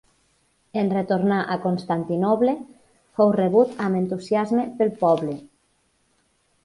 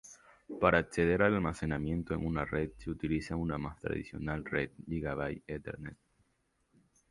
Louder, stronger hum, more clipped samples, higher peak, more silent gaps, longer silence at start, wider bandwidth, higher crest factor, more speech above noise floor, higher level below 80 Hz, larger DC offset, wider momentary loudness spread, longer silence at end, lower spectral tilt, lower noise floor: first, -22 LUFS vs -34 LUFS; neither; neither; first, -6 dBFS vs -10 dBFS; neither; first, 0.75 s vs 0.05 s; about the same, 11.5 kHz vs 11.5 kHz; second, 18 dB vs 24 dB; about the same, 45 dB vs 43 dB; second, -64 dBFS vs -50 dBFS; neither; second, 8 LU vs 14 LU; about the same, 1.2 s vs 1.15 s; about the same, -8 dB/octave vs -7 dB/octave; second, -66 dBFS vs -77 dBFS